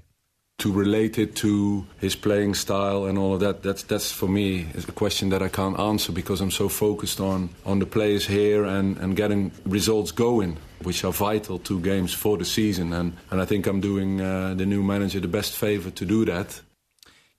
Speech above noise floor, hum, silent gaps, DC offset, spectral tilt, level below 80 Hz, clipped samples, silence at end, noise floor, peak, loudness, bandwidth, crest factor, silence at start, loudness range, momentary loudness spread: 47 dB; none; none; under 0.1%; -5 dB/octave; -48 dBFS; under 0.1%; 0.8 s; -71 dBFS; -8 dBFS; -24 LUFS; 14 kHz; 16 dB; 0.6 s; 2 LU; 6 LU